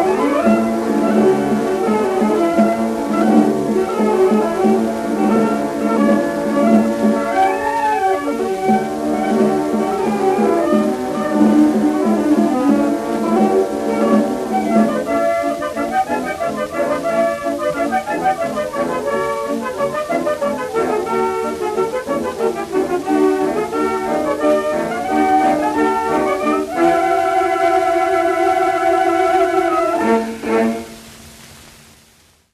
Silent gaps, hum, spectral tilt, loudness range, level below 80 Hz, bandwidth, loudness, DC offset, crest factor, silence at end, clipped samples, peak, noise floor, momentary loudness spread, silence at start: none; none; -6 dB/octave; 4 LU; -50 dBFS; 14 kHz; -16 LUFS; under 0.1%; 16 dB; 0.95 s; under 0.1%; 0 dBFS; -52 dBFS; 6 LU; 0 s